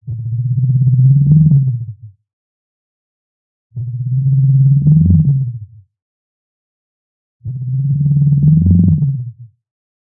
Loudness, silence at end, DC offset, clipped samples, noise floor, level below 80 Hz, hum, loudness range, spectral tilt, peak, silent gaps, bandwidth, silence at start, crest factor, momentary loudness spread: -12 LUFS; 0.6 s; under 0.1%; under 0.1%; -32 dBFS; -42 dBFS; none; 4 LU; -18.5 dB/octave; -2 dBFS; 2.33-3.70 s, 6.02-7.40 s; 0.8 kHz; 0.05 s; 12 dB; 17 LU